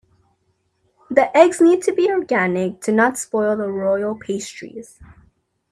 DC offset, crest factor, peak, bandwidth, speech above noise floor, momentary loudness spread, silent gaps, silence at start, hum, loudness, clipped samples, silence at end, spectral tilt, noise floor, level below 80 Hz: under 0.1%; 20 dB; 0 dBFS; 13 kHz; 49 dB; 14 LU; none; 1.1 s; none; -18 LUFS; under 0.1%; 0.7 s; -5 dB/octave; -67 dBFS; -60 dBFS